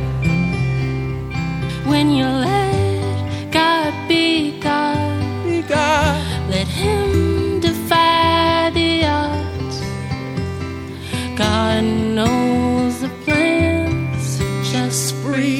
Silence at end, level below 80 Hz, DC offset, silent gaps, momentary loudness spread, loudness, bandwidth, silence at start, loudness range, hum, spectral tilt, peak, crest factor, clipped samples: 0 s; -38 dBFS; under 0.1%; none; 9 LU; -18 LUFS; 16.5 kHz; 0 s; 3 LU; none; -5.5 dB/octave; 0 dBFS; 16 dB; under 0.1%